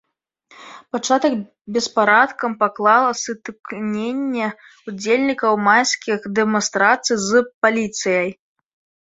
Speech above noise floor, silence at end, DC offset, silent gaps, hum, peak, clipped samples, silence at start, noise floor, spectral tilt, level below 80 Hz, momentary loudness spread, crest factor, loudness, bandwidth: 38 dB; 0.75 s; under 0.1%; 1.61-1.65 s, 7.54-7.61 s; none; -2 dBFS; under 0.1%; 0.6 s; -57 dBFS; -3 dB/octave; -64 dBFS; 13 LU; 18 dB; -18 LUFS; 8 kHz